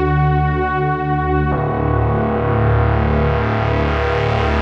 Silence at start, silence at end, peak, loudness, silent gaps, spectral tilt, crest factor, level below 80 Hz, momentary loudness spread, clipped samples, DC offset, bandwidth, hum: 0 s; 0 s; -4 dBFS; -17 LUFS; none; -9 dB/octave; 12 dB; -24 dBFS; 3 LU; under 0.1%; under 0.1%; 6.4 kHz; none